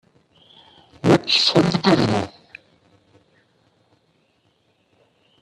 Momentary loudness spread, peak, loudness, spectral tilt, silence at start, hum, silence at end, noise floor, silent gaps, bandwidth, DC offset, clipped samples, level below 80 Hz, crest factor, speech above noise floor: 10 LU; 0 dBFS; -17 LUFS; -5.5 dB/octave; 1.05 s; none; 3.15 s; -64 dBFS; none; 11.5 kHz; under 0.1%; under 0.1%; -56 dBFS; 22 dB; 46 dB